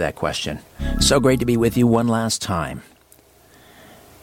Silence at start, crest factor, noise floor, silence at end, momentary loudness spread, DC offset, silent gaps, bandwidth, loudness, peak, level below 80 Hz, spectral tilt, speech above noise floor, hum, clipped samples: 0 s; 16 dB; -52 dBFS; 1.4 s; 13 LU; under 0.1%; none; 17 kHz; -19 LUFS; -4 dBFS; -34 dBFS; -4.5 dB/octave; 33 dB; none; under 0.1%